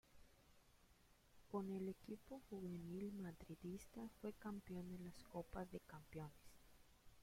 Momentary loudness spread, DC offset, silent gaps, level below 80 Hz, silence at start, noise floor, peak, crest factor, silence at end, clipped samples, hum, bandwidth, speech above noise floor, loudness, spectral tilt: 7 LU; under 0.1%; none; -70 dBFS; 0.05 s; -73 dBFS; -34 dBFS; 20 dB; 0 s; under 0.1%; none; 16.5 kHz; 21 dB; -54 LUFS; -7 dB/octave